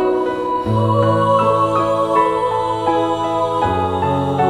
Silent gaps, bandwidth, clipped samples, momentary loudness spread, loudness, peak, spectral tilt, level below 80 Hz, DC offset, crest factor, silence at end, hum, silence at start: none; 12 kHz; under 0.1%; 4 LU; -17 LUFS; -4 dBFS; -7.5 dB/octave; -44 dBFS; under 0.1%; 12 dB; 0 s; none; 0 s